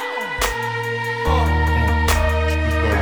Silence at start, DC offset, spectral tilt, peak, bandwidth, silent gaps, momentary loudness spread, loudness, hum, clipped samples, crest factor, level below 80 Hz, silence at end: 0 s; under 0.1%; -5 dB/octave; -4 dBFS; over 20 kHz; none; 5 LU; -19 LUFS; none; under 0.1%; 16 dB; -22 dBFS; 0 s